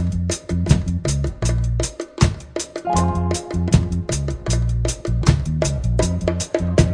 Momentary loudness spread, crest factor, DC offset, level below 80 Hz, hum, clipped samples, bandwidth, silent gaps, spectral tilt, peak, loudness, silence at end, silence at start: 5 LU; 18 dB; under 0.1%; -26 dBFS; none; under 0.1%; 10 kHz; none; -5.5 dB/octave; 0 dBFS; -21 LUFS; 0 s; 0 s